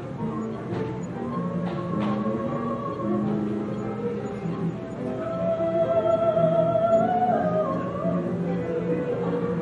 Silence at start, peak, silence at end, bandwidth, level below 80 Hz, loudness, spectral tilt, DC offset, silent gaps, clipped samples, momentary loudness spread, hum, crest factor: 0 s; -10 dBFS; 0 s; 8 kHz; -56 dBFS; -26 LUFS; -9 dB/octave; under 0.1%; none; under 0.1%; 9 LU; none; 16 dB